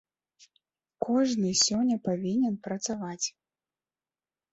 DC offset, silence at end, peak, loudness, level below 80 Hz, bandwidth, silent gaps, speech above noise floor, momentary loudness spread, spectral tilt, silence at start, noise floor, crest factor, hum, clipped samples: under 0.1%; 1.25 s; -12 dBFS; -28 LUFS; -70 dBFS; 8.2 kHz; none; over 62 dB; 10 LU; -4 dB/octave; 1 s; under -90 dBFS; 20 dB; none; under 0.1%